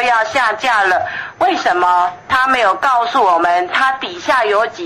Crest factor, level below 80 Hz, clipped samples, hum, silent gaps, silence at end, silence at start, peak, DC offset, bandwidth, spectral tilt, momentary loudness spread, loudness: 12 dB; -52 dBFS; under 0.1%; none; none; 0 s; 0 s; -2 dBFS; under 0.1%; 13 kHz; -2.5 dB/octave; 4 LU; -14 LUFS